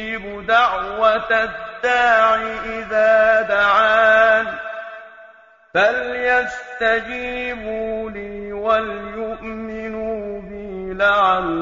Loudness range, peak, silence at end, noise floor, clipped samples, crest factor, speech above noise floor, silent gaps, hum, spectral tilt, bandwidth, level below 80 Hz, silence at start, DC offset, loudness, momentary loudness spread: 9 LU; -2 dBFS; 0 s; -47 dBFS; under 0.1%; 16 dB; 30 dB; none; none; -4.5 dB/octave; 7.6 kHz; -46 dBFS; 0 s; under 0.1%; -18 LUFS; 16 LU